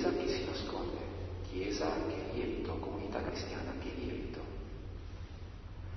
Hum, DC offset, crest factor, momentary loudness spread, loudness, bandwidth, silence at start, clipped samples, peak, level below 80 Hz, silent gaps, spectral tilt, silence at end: none; under 0.1%; 18 dB; 12 LU; -40 LUFS; 6.2 kHz; 0 s; under 0.1%; -20 dBFS; -48 dBFS; none; -5 dB/octave; 0 s